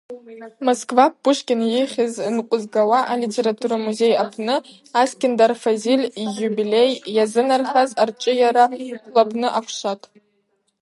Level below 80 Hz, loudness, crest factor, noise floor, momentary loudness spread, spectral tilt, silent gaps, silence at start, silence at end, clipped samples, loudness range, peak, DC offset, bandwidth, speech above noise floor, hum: -76 dBFS; -19 LUFS; 18 dB; -68 dBFS; 8 LU; -4 dB/octave; none; 0.1 s; 0.85 s; under 0.1%; 2 LU; 0 dBFS; under 0.1%; 11.5 kHz; 49 dB; none